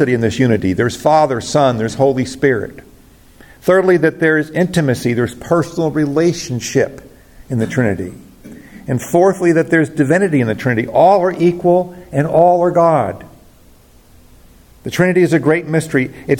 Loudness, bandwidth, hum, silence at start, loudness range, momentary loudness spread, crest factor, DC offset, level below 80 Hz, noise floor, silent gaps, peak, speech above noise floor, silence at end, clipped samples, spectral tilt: -14 LUFS; 17 kHz; none; 0 s; 5 LU; 10 LU; 14 dB; under 0.1%; -48 dBFS; -45 dBFS; none; 0 dBFS; 31 dB; 0 s; under 0.1%; -6.5 dB/octave